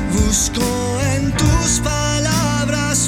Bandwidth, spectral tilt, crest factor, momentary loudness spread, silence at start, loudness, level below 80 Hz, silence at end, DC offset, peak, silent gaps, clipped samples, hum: 18.5 kHz; -4 dB/octave; 14 dB; 3 LU; 0 s; -17 LUFS; -26 dBFS; 0 s; under 0.1%; -2 dBFS; none; under 0.1%; none